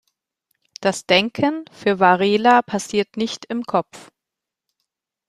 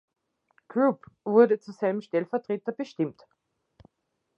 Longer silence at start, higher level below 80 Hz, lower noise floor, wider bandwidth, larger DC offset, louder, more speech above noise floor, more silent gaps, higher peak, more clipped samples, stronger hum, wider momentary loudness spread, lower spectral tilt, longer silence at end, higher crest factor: about the same, 0.8 s vs 0.75 s; first, -64 dBFS vs -74 dBFS; first, -85 dBFS vs -79 dBFS; first, 13.5 kHz vs 7 kHz; neither; first, -19 LUFS vs -27 LUFS; first, 66 dB vs 53 dB; neither; first, 0 dBFS vs -6 dBFS; neither; neither; second, 9 LU vs 12 LU; second, -4.5 dB/octave vs -8 dB/octave; about the same, 1.3 s vs 1.25 s; about the same, 20 dB vs 22 dB